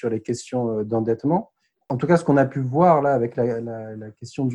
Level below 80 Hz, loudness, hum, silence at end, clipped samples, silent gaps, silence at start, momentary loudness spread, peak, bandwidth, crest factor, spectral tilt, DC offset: -58 dBFS; -21 LUFS; none; 0 s; under 0.1%; none; 0.05 s; 15 LU; -2 dBFS; 11 kHz; 18 dB; -8 dB/octave; under 0.1%